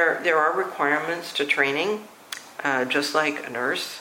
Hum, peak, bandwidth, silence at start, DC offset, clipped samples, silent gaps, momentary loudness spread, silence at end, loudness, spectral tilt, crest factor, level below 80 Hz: none; -6 dBFS; 16.5 kHz; 0 s; under 0.1%; under 0.1%; none; 10 LU; 0 s; -23 LUFS; -3 dB/octave; 18 dB; -78 dBFS